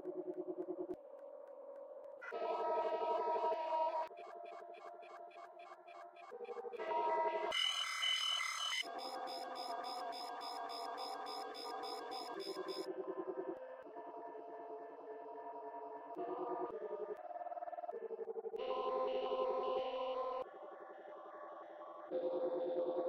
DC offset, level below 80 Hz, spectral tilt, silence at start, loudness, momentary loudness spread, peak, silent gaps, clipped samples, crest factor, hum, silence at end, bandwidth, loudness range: under 0.1%; -86 dBFS; -1.5 dB/octave; 0 s; -42 LUFS; 16 LU; -26 dBFS; none; under 0.1%; 18 dB; none; 0 s; 16 kHz; 9 LU